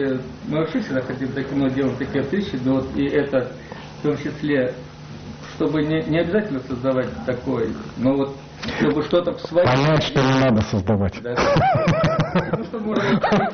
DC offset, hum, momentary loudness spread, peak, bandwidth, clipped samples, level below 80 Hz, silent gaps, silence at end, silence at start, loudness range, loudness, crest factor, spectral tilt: under 0.1%; none; 9 LU; -4 dBFS; 6.6 kHz; under 0.1%; -42 dBFS; none; 0 s; 0 s; 5 LU; -21 LUFS; 16 dB; -7 dB/octave